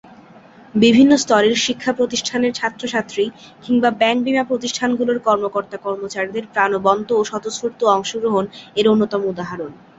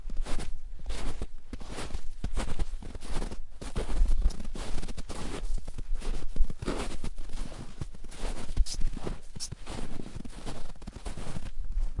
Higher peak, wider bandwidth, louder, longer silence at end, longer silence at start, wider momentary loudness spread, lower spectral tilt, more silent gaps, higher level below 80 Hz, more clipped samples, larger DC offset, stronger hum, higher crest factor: first, -2 dBFS vs -10 dBFS; second, 8 kHz vs 11.5 kHz; first, -18 LUFS vs -39 LUFS; first, 0.25 s vs 0 s; about the same, 0.1 s vs 0 s; about the same, 11 LU vs 10 LU; about the same, -4 dB/octave vs -5 dB/octave; neither; second, -58 dBFS vs -32 dBFS; neither; neither; neither; about the same, 16 dB vs 18 dB